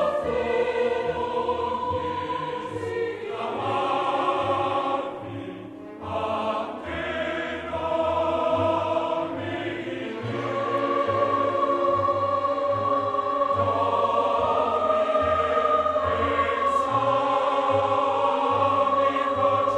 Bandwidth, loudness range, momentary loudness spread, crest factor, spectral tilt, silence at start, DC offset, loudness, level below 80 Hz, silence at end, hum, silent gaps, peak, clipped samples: 10 kHz; 5 LU; 8 LU; 16 dB; -6 dB/octave; 0 s; under 0.1%; -24 LUFS; -54 dBFS; 0 s; none; none; -10 dBFS; under 0.1%